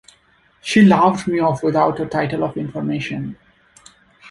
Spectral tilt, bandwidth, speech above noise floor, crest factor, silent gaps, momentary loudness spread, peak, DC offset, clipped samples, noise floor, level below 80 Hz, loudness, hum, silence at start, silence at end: -6.5 dB/octave; 11.5 kHz; 40 dB; 16 dB; none; 14 LU; -2 dBFS; under 0.1%; under 0.1%; -56 dBFS; -54 dBFS; -17 LUFS; none; 0.65 s; 0 s